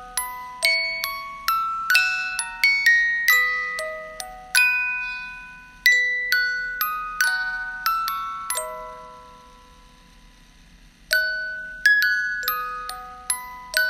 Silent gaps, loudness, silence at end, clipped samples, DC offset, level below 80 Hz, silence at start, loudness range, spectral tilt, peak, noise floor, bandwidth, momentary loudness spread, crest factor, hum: none; -21 LUFS; 0 s; under 0.1%; under 0.1%; -54 dBFS; 0 s; 10 LU; 1.5 dB/octave; 0 dBFS; -50 dBFS; 16 kHz; 16 LU; 24 dB; none